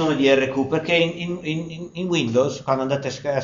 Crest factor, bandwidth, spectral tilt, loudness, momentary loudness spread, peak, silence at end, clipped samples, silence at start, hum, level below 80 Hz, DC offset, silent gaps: 16 dB; 7.4 kHz; -4 dB/octave; -21 LUFS; 10 LU; -4 dBFS; 0 s; under 0.1%; 0 s; none; -56 dBFS; under 0.1%; none